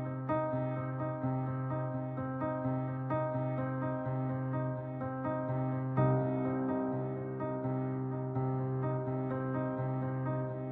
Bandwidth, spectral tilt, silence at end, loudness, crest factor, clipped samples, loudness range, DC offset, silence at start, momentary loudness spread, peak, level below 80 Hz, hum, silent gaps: 3.7 kHz; -10 dB/octave; 0 s; -35 LUFS; 16 dB; under 0.1%; 2 LU; under 0.1%; 0 s; 4 LU; -18 dBFS; -66 dBFS; none; none